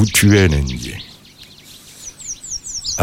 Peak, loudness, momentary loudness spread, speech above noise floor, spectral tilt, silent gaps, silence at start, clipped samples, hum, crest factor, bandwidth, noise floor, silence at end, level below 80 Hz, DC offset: 0 dBFS; -17 LUFS; 26 LU; 28 dB; -4.5 dB/octave; none; 0 s; under 0.1%; none; 18 dB; 16.5 kHz; -42 dBFS; 0 s; -30 dBFS; under 0.1%